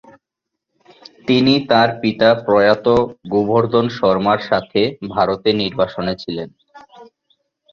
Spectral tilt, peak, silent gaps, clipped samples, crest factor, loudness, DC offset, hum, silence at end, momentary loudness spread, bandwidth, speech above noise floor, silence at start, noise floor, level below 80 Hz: -7 dB/octave; 0 dBFS; none; under 0.1%; 16 dB; -16 LUFS; under 0.1%; none; 0.7 s; 10 LU; 7 kHz; 65 dB; 1.25 s; -81 dBFS; -50 dBFS